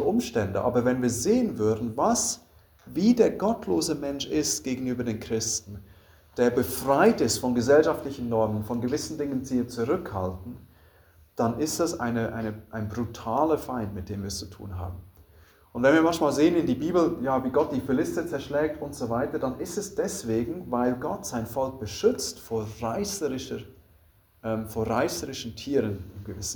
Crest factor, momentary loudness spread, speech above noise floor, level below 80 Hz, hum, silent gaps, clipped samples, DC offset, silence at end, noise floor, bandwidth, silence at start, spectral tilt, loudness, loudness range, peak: 20 dB; 13 LU; 33 dB; -54 dBFS; none; none; under 0.1%; under 0.1%; 0 s; -60 dBFS; over 20 kHz; 0 s; -5 dB/octave; -27 LUFS; 6 LU; -6 dBFS